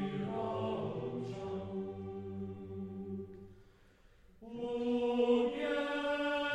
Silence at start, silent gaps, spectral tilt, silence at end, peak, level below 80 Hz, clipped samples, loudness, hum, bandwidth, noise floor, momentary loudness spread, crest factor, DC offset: 0 s; none; -7 dB/octave; 0 s; -20 dBFS; -64 dBFS; under 0.1%; -37 LUFS; none; 9.2 kHz; -63 dBFS; 13 LU; 18 dB; under 0.1%